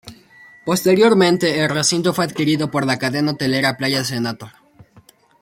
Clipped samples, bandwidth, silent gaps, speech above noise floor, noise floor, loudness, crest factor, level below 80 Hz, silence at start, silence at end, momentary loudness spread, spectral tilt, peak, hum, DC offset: under 0.1%; 16.5 kHz; none; 33 dB; -51 dBFS; -17 LUFS; 16 dB; -58 dBFS; 0.05 s; 0.9 s; 9 LU; -4.5 dB/octave; -2 dBFS; none; under 0.1%